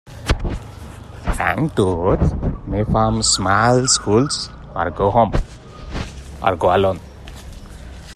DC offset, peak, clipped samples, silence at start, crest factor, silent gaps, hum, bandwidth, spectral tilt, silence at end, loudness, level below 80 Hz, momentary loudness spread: under 0.1%; 0 dBFS; under 0.1%; 0.05 s; 18 dB; none; none; 13.5 kHz; -4.5 dB/octave; 0 s; -18 LUFS; -30 dBFS; 22 LU